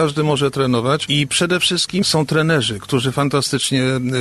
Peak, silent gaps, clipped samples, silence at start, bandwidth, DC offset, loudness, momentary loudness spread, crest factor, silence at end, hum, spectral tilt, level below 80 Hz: -4 dBFS; none; under 0.1%; 0 s; 13 kHz; under 0.1%; -17 LUFS; 3 LU; 14 dB; 0 s; none; -4.5 dB/octave; -50 dBFS